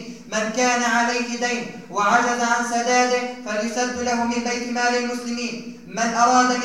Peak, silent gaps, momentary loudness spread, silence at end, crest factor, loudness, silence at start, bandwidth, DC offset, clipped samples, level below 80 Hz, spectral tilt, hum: -4 dBFS; none; 9 LU; 0 s; 18 dB; -21 LUFS; 0 s; 14 kHz; 0.3%; under 0.1%; -60 dBFS; -2.5 dB/octave; none